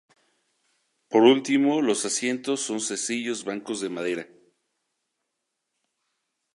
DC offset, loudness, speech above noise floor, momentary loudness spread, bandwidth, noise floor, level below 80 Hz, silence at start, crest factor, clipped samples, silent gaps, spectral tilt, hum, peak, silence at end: under 0.1%; -24 LUFS; 57 dB; 13 LU; 11.5 kHz; -81 dBFS; -80 dBFS; 1.1 s; 22 dB; under 0.1%; none; -3 dB/octave; none; -6 dBFS; 2.3 s